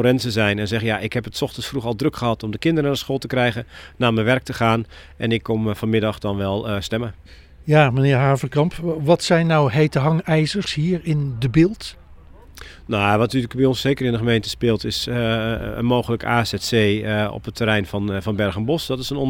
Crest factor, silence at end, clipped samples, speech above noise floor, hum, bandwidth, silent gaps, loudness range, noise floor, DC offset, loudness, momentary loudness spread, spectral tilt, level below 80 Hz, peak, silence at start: 20 dB; 0 s; under 0.1%; 23 dB; none; 17 kHz; none; 4 LU; -43 dBFS; under 0.1%; -20 LUFS; 8 LU; -6 dB/octave; -44 dBFS; 0 dBFS; 0 s